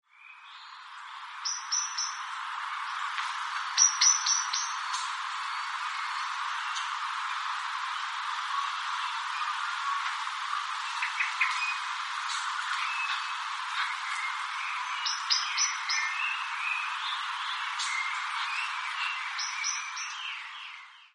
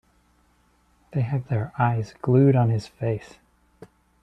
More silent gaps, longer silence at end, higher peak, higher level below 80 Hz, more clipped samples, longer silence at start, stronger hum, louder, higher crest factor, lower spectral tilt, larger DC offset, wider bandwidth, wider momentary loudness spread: neither; second, 0.05 s vs 1.05 s; about the same, -8 dBFS vs -8 dBFS; second, under -90 dBFS vs -58 dBFS; neither; second, 0.15 s vs 1.15 s; second, none vs 60 Hz at -40 dBFS; second, -30 LUFS vs -23 LUFS; first, 24 dB vs 18 dB; second, 11.5 dB/octave vs -9.5 dB/octave; neither; first, 11.5 kHz vs 8.4 kHz; second, 8 LU vs 11 LU